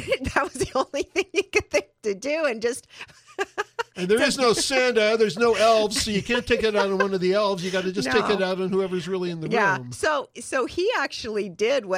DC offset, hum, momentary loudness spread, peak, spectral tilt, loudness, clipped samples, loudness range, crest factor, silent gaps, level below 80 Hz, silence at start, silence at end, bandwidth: under 0.1%; none; 10 LU; -4 dBFS; -3.5 dB/octave; -23 LUFS; under 0.1%; 5 LU; 20 dB; none; -52 dBFS; 0 s; 0 s; 15 kHz